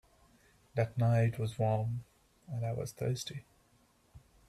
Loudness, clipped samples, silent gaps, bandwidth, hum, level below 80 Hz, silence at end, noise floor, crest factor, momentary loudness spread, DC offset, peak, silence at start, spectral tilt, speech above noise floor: -35 LUFS; under 0.1%; none; 13 kHz; none; -64 dBFS; 0.3 s; -69 dBFS; 18 dB; 14 LU; under 0.1%; -18 dBFS; 0.75 s; -6.5 dB/octave; 36 dB